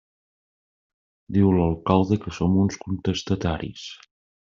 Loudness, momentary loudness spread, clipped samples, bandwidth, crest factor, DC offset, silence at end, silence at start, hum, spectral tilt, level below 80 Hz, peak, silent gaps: -23 LUFS; 12 LU; under 0.1%; 7.4 kHz; 22 dB; under 0.1%; 0.5 s; 1.3 s; none; -7 dB/octave; -48 dBFS; -4 dBFS; none